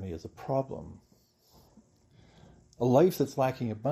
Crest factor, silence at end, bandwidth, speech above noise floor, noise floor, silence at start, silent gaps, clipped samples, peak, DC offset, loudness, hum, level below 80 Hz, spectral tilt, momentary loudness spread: 22 dB; 0 s; 15 kHz; 36 dB; -64 dBFS; 0 s; none; under 0.1%; -10 dBFS; under 0.1%; -29 LUFS; none; -62 dBFS; -7.5 dB/octave; 18 LU